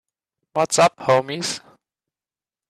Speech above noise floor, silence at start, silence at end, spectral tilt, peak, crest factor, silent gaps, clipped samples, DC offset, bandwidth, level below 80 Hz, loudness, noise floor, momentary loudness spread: over 71 dB; 0.55 s; 1.1 s; -3 dB/octave; -4 dBFS; 18 dB; none; under 0.1%; under 0.1%; 14 kHz; -62 dBFS; -20 LUFS; under -90 dBFS; 12 LU